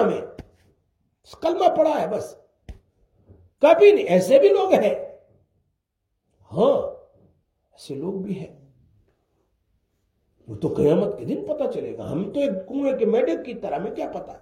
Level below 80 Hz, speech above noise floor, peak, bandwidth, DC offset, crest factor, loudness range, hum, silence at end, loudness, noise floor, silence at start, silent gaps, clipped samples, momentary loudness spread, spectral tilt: -58 dBFS; 57 dB; -2 dBFS; 15.5 kHz; under 0.1%; 20 dB; 12 LU; none; 0.05 s; -21 LUFS; -77 dBFS; 0 s; none; under 0.1%; 17 LU; -6.5 dB/octave